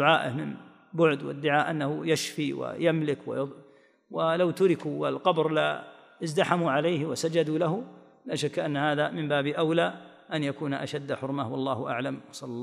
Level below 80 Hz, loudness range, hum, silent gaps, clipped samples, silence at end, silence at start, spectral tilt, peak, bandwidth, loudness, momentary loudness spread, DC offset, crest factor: -78 dBFS; 2 LU; none; none; under 0.1%; 0 s; 0 s; -5.5 dB/octave; -6 dBFS; 15.5 kHz; -28 LUFS; 11 LU; under 0.1%; 20 dB